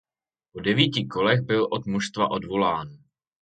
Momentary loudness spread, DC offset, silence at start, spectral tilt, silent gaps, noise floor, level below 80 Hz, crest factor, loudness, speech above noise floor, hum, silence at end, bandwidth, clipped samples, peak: 9 LU; under 0.1%; 0.55 s; -5.5 dB/octave; none; -88 dBFS; -58 dBFS; 22 dB; -24 LUFS; 64 dB; none; 0.45 s; 9.2 kHz; under 0.1%; -2 dBFS